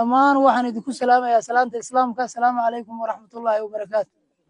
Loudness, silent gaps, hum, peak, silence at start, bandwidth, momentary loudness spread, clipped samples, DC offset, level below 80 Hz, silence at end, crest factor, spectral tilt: -21 LUFS; none; none; -4 dBFS; 0 s; 10.5 kHz; 12 LU; under 0.1%; under 0.1%; -72 dBFS; 0.45 s; 16 dB; -4 dB/octave